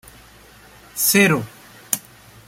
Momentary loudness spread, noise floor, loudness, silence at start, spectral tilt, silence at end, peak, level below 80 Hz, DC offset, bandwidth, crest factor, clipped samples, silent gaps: 18 LU; -47 dBFS; -18 LUFS; 0.95 s; -3.5 dB/octave; 0.5 s; 0 dBFS; -56 dBFS; under 0.1%; 16.5 kHz; 22 dB; under 0.1%; none